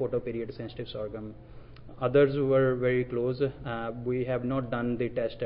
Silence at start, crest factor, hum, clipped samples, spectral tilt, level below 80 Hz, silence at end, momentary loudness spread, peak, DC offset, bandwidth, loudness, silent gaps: 0 s; 18 dB; none; under 0.1%; -11.5 dB/octave; -52 dBFS; 0 s; 14 LU; -12 dBFS; under 0.1%; 5.4 kHz; -29 LUFS; none